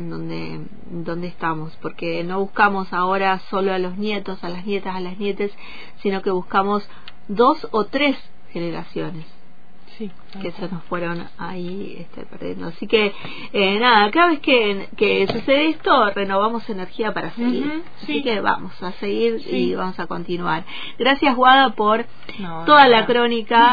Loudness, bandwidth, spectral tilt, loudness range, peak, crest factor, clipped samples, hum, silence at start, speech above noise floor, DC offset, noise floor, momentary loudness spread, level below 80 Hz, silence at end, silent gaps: -19 LUFS; 5 kHz; -7 dB/octave; 10 LU; -2 dBFS; 18 dB; under 0.1%; none; 0 s; 31 dB; 4%; -51 dBFS; 18 LU; -52 dBFS; 0 s; none